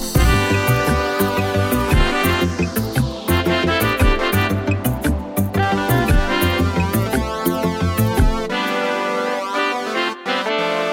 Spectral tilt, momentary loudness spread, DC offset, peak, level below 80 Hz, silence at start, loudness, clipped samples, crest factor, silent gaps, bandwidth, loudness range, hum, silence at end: -5.5 dB/octave; 5 LU; under 0.1%; -2 dBFS; -26 dBFS; 0 s; -18 LUFS; under 0.1%; 14 dB; none; 17 kHz; 2 LU; none; 0 s